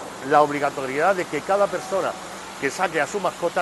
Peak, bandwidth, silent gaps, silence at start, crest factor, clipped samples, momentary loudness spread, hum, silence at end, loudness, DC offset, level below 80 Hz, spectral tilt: -2 dBFS; 12.5 kHz; none; 0 s; 20 dB; under 0.1%; 9 LU; none; 0 s; -22 LUFS; under 0.1%; -60 dBFS; -4 dB/octave